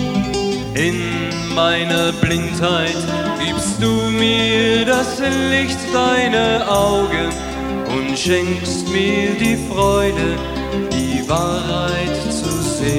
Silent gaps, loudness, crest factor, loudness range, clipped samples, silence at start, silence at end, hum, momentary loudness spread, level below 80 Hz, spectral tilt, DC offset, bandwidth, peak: none; -17 LUFS; 16 dB; 2 LU; under 0.1%; 0 s; 0 s; none; 6 LU; -34 dBFS; -4.5 dB/octave; under 0.1%; 16.5 kHz; -2 dBFS